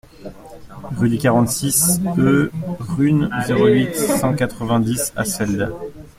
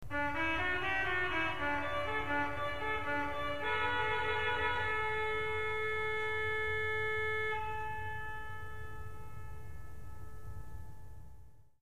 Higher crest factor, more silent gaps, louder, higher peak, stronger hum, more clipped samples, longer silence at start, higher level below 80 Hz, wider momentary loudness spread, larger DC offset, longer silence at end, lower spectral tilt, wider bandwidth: about the same, 16 dB vs 16 dB; neither; first, -18 LUFS vs -35 LUFS; first, -2 dBFS vs -20 dBFS; neither; neither; first, 0.2 s vs 0 s; first, -44 dBFS vs -54 dBFS; second, 14 LU vs 18 LU; second, under 0.1% vs 0.8%; about the same, 0.1 s vs 0 s; about the same, -5 dB/octave vs -5 dB/octave; about the same, 16.5 kHz vs 15.5 kHz